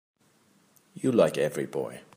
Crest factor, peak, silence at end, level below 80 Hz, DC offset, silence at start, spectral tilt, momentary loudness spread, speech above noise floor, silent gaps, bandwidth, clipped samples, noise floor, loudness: 20 dB; -10 dBFS; 0.15 s; -72 dBFS; under 0.1%; 0.95 s; -6 dB/octave; 10 LU; 38 dB; none; 15.5 kHz; under 0.1%; -64 dBFS; -27 LUFS